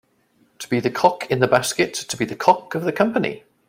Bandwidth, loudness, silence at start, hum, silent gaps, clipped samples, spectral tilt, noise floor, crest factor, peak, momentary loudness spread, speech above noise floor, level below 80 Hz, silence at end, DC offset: 16.5 kHz; -20 LUFS; 0.6 s; none; none; under 0.1%; -4.5 dB/octave; -61 dBFS; 20 dB; 0 dBFS; 7 LU; 41 dB; -58 dBFS; 0.3 s; under 0.1%